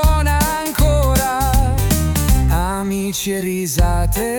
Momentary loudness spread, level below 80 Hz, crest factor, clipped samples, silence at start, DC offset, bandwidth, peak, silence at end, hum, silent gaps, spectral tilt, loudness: 5 LU; -18 dBFS; 12 dB; under 0.1%; 0 s; under 0.1%; 19 kHz; -2 dBFS; 0 s; none; none; -5 dB/octave; -17 LUFS